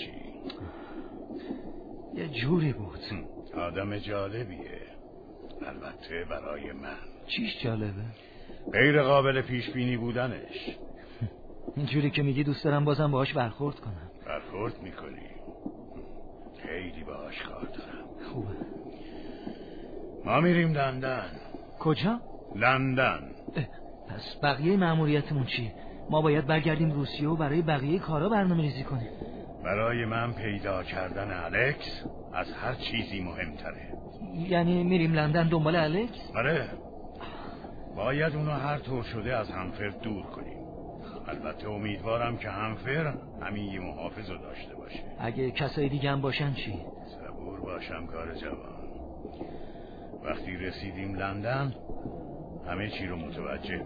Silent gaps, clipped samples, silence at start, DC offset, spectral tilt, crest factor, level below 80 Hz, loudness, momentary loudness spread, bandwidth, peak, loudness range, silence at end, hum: none; under 0.1%; 0 s; under 0.1%; -9 dB/octave; 22 dB; -48 dBFS; -31 LUFS; 18 LU; 5 kHz; -8 dBFS; 12 LU; 0 s; none